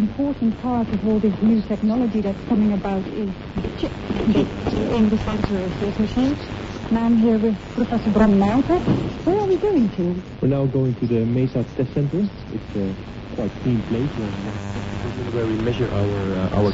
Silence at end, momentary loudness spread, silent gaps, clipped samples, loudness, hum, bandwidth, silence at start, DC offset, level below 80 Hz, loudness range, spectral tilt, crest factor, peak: 0 s; 10 LU; none; under 0.1%; -21 LUFS; none; 7.8 kHz; 0 s; under 0.1%; -38 dBFS; 5 LU; -8.5 dB/octave; 18 dB; -2 dBFS